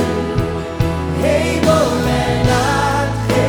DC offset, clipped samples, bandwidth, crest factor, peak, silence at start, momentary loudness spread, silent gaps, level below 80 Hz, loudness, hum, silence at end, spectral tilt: under 0.1%; under 0.1%; 20 kHz; 14 dB; 0 dBFS; 0 s; 6 LU; none; -28 dBFS; -16 LUFS; none; 0 s; -5.5 dB/octave